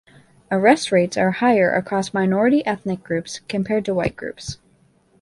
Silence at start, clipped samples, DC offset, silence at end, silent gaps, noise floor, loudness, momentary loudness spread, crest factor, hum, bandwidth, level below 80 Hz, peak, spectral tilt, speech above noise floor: 0.5 s; under 0.1%; under 0.1%; 0.65 s; none; -58 dBFS; -20 LUFS; 13 LU; 20 dB; none; 11.5 kHz; -52 dBFS; -2 dBFS; -5.5 dB/octave; 39 dB